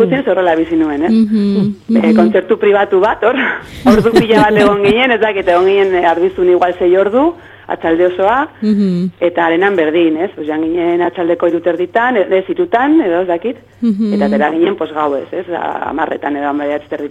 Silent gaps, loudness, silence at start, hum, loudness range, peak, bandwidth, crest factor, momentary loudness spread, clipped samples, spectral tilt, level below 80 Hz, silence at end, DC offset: none; -12 LUFS; 0 s; none; 4 LU; 0 dBFS; 12 kHz; 12 dB; 8 LU; under 0.1%; -7 dB/octave; -44 dBFS; 0 s; under 0.1%